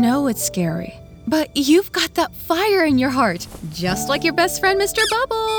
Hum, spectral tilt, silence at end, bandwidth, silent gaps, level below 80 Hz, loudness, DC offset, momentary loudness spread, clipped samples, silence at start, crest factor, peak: none; -4 dB/octave; 0 s; over 20 kHz; none; -44 dBFS; -19 LUFS; under 0.1%; 9 LU; under 0.1%; 0 s; 16 dB; -4 dBFS